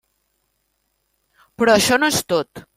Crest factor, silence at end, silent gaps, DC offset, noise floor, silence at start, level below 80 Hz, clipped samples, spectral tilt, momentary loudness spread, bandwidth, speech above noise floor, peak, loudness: 20 dB; 0.15 s; none; under 0.1%; -70 dBFS; 1.6 s; -56 dBFS; under 0.1%; -3 dB/octave; 9 LU; 16.5 kHz; 53 dB; 0 dBFS; -17 LUFS